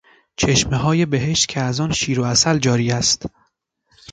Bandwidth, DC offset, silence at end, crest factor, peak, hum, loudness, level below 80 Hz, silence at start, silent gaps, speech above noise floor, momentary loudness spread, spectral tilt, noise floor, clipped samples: 9.6 kHz; under 0.1%; 0.85 s; 16 dB; -2 dBFS; none; -18 LUFS; -42 dBFS; 0.4 s; none; 48 dB; 6 LU; -4 dB/octave; -66 dBFS; under 0.1%